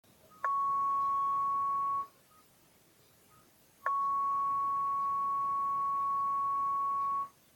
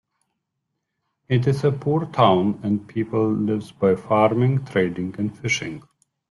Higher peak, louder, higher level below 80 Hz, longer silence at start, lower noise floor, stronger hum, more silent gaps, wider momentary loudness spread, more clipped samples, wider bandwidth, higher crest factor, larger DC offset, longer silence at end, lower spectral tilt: second, -16 dBFS vs -2 dBFS; second, -32 LUFS vs -21 LUFS; second, -74 dBFS vs -58 dBFS; second, 0.4 s vs 1.3 s; second, -65 dBFS vs -78 dBFS; neither; neither; second, 4 LU vs 8 LU; neither; first, 17.5 kHz vs 11.5 kHz; about the same, 16 dB vs 20 dB; neither; second, 0.25 s vs 0.5 s; second, -4 dB/octave vs -7 dB/octave